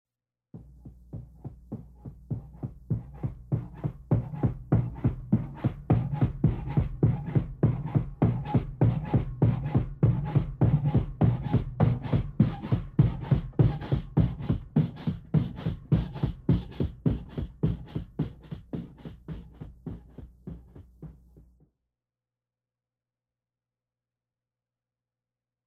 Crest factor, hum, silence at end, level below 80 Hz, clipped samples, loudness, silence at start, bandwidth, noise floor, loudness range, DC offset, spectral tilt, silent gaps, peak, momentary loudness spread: 20 dB; 60 Hz at -50 dBFS; 4.55 s; -42 dBFS; under 0.1%; -29 LUFS; 0.55 s; 4.4 kHz; under -90 dBFS; 14 LU; under 0.1%; -11 dB/octave; none; -8 dBFS; 19 LU